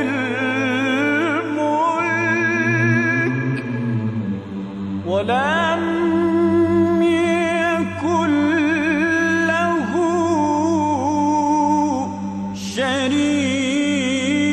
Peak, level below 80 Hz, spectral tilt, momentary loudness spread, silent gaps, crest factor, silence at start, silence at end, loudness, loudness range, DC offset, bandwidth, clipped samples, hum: -6 dBFS; -54 dBFS; -5.5 dB/octave; 7 LU; none; 12 dB; 0 s; 0 s; -19 LUFS; 3 LU; under 0.1%; 11 kHz; under 0.1%; none